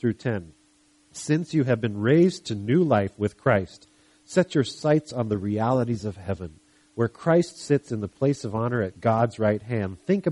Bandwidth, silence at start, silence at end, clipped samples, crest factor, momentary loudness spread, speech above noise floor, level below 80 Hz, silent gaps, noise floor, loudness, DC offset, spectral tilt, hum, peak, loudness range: 11.5 kHz; 0.05 s; 0 s; under 0.1%; 18 dB; 11 LU; 37 dB; -58 dBFS; none; -61 dBFS; -25 LUFS; under 0.1%; -7 dB/octave; none; -6 dBFS; 3 LU